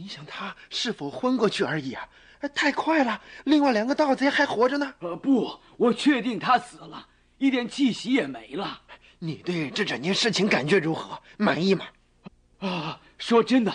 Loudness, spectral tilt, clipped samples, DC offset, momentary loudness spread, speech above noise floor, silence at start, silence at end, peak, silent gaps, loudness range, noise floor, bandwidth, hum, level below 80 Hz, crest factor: -25 LUFS; -5 dB/octave; under 0.1%; under 0.1%; 14 LU; 26 dB; 0 s; 0 s; -8 dBFS; none; 4 LU; -51 dBFS; 10 kHz; none; -64 dBFS; 16 dB